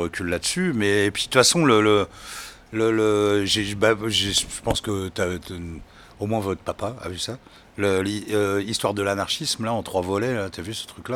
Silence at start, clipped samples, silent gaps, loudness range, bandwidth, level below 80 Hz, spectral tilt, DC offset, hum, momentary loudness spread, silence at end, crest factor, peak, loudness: 0 s; under 0.1%; none; 8 LU; 19 kHz; -48 dBFS; -3.5 dB/octave; under 0.1%; none; 15 LU; 0 s; 22 dB; -2 dBFS; -22 LUFS